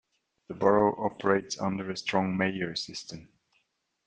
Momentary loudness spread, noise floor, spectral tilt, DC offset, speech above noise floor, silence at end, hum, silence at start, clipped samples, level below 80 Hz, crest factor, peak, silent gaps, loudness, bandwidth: 16 LU; -75 dBFS; -5 dB/octave; under 0.1%; 46 dB; 0.85 s; none; 0.5 s; under 0.1%; -66 dBFS; 22 dB; -8 dBFS; none; -28 LUFS; 9.4 kHz